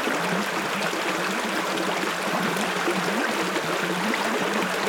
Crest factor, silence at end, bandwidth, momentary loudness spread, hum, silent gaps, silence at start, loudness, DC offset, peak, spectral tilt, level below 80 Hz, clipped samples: 14 dB; 0 s; 19.5 kHz; 1 LU; none; none; 0 s; -25 LUFS; under 0.1%; -12 dBFS; -3.5 dB/octave; -66 dBFS; under 0.1%